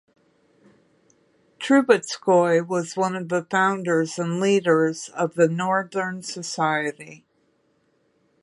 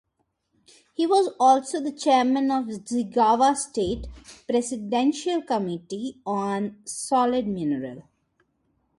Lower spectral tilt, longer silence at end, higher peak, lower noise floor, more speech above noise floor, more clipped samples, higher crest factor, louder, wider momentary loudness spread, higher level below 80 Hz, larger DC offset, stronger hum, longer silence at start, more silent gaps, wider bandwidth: about the same, -5 dB/octave vs -4.5 dB/octave; first, 1.25 s vs 0.95 s; first, -2 dBFS vs -8 dBFS; second, -66 dBFS vs -75 dBFS; second, 44 dB vs 51 dB; neither; about the same, 20 dB vs 18 dB; about the same, -22 LUFS vs -24 LUFS; about the same, 11 LU vs 13 LU; second, -74 dBFS vs -52 dBFS; neither; neither; first, 1.6 s vs 1 s; neither; about the same, 11.5 kHz vs 11.5 kHz